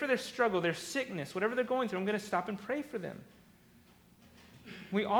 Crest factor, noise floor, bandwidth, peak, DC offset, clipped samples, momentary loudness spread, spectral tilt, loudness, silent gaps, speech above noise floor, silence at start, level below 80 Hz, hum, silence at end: 20 dB; -62 dBFS; over 20 kHz; -16 dBFS; under 0.1%; under 0.1%; 16 LU; -5 dB/octave; -34 LUFS; none; 28 dB; 0 s; -72 dBFS; none; 0 s